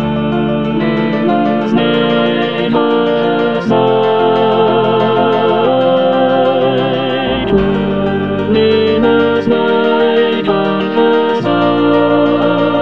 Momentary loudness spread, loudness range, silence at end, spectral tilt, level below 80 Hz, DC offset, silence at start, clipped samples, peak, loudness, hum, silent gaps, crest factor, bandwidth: 4 LU; 1 LU; 0 s; -8 dB/octave; -40 dBFS; 1%; 0 s; under 0.1%; 0 dBFS; -12 LUFS; none; none; 12 dB; 6.2 kHz